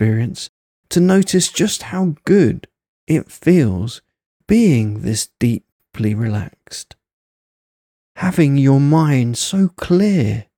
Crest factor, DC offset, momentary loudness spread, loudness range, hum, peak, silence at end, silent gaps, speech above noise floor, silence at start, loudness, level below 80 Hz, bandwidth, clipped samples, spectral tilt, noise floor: 16 dB; under 0.1%; 16 LU; 6 LU; none; -2 dBFS; 0.15 s; 0.49-0.83 s, 2.88-3.07 s, 4.26-4.40 s, 5.72-5.79 s, 7.13-8.15 s; over 75 dB; 0 s; -16 LUFS; -48 dBFS; 17.5 kHz; under 0.1%; -6 dB/octave; under -90 dBFS